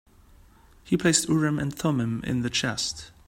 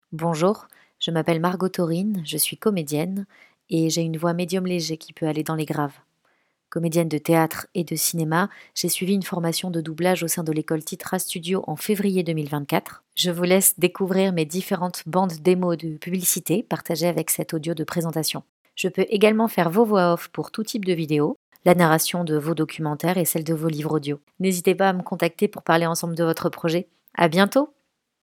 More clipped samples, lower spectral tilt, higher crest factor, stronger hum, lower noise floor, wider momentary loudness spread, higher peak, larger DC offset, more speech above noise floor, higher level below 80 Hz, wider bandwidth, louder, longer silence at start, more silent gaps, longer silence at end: neither; about the same, -4 dB/octave vs -4.5 dB/octave; about the same, 20 dB vs 22 dB; neither; second, -54 dBFS vs -68 dBFS; about the same, 7 LU vs 9 LU; second, -6 dBFS vs 0 dBFS; neither; second, 29 dB vs 45 dB; first, -52 dBFS vs -70 dBFS; second, 16 kHz vs 18.5 kHz; about the same, -25 LUFS vs -23 LUFS; first, 0.85 s vs 0.1 s; second, none vs 18.49-18.65 s, 21.36-21.52 s, 24.23-24.27 s; second, 0.2 s vs 0.6 s